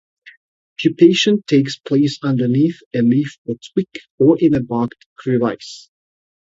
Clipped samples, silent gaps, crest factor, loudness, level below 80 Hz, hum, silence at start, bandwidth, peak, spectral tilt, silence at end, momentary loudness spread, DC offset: under 0.1%; 0.37-0.76 s, 2.86-2.91 s, 3.38-3.45 s, 4.10-4.18 s, 5.06-5.16 s; 18 dB; -17 LUFS; -56 dBFS; none; 0.25 s; 7.8 kHz; 0 dBFS; -6.5 dB/octave; 0.7 s; 16 LU; under 0.1%